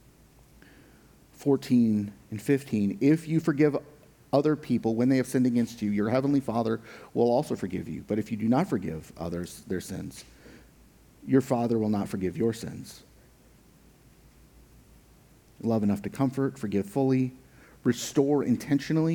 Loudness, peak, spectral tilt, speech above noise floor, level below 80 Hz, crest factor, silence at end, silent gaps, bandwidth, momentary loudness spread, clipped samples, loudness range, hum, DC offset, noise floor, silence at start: -27 LUFS; -8 dBFS; -7 dB/octave; 31 dB; -60 dBFS; 20 dB; 0 s; none; 19 kHz; 11 LU; under 0.1%; 7 LU; none; under 0.1%; -57 dBFS; 1.4 s